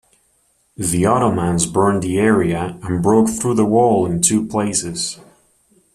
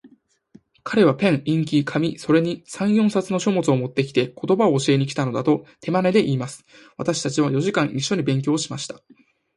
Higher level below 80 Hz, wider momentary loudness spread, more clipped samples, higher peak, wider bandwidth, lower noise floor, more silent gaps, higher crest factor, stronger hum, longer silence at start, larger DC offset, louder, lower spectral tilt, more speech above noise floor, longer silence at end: first, -46 dBFS vs -62 dBFS; about the same, 9 LU vs 9 LU; neither; about the same, -2 dBFS vs -4 dBFS; first, 14 kHz vs 11.5 kHz; first, -61 dBFS vs -54 dBFS; neither; about the same, 16 dB vs 16 dB; neither; first, 0.8 s vs 0.05 s; neither; first, -17 LUFS vs -21 LUFS; about the same, -5 dB/octave vs -6 dB/octave; first, 45 dB vs 34 dB; first, 0.8 s vs 0.65 s